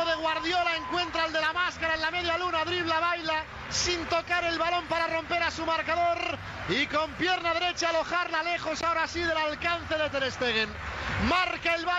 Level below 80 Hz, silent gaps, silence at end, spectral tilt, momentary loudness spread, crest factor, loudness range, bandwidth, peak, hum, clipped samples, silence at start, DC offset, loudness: -50 dBFS; none; 0 s; -3 dB/octave; 3 LU; 14 dB; 1 LU; 9.8 kHz; -14 dBFS; none; under 0.1%; 0 s; under 0.1%; -28 LUFS